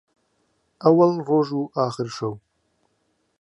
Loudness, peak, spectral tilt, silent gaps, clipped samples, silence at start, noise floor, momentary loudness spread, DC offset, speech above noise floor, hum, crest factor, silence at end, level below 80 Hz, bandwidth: -21 LUFS; -2 dBFS; -7.5 dB/octave; none; under 0.1%; 0.8 s; -70 dBFS; 14 LU; under 0.1%; 49 dB; none; 20 dB; 1.05 s; -70 dBFS; 10.5 kHz